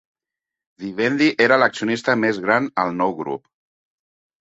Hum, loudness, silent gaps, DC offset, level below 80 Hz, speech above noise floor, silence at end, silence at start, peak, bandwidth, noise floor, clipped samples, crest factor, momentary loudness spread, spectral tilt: none; -19 LUFS; none; under 0.1%; -64 dBFS; 68 dB; 1.05 s; 0.8 s; -2 dBFS; 8 kHz; -87 dBFS; under 0.1%; 20 dB; 14 LU; -5 dB/octave